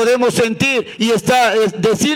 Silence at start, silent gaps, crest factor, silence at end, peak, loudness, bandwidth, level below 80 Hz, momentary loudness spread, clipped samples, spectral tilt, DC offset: 0 s; none; 12 dB; 0 s; -4 dBFS; -14 LUFS; 17.5 kHz; -50 dBFS; 4 LU; under 0.1%; -4 dB/octave; under 0.1%